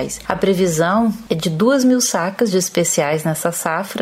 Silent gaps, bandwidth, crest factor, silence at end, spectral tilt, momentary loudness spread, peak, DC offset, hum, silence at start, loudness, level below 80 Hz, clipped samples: none; 16 kHz; 14 dB; 0 s; -4.5 dB/octave; 6 LU; -2 dBFS; under 0.1%; none; 0 s; -17 LUFS; -50 dBFS; under 0.1%